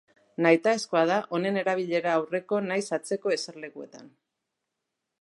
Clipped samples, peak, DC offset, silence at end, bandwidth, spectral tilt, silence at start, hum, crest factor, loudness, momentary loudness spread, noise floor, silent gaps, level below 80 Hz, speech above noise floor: under 0.1%; -6 dBFS; under 0.1%; 1.15 s; 11.5 kHz; -5 dB/octave; 0.4 s; none; 22 dB; -26 LUFS; 18 LU; -84 dBFS; none; -82 dBFS; 57 dB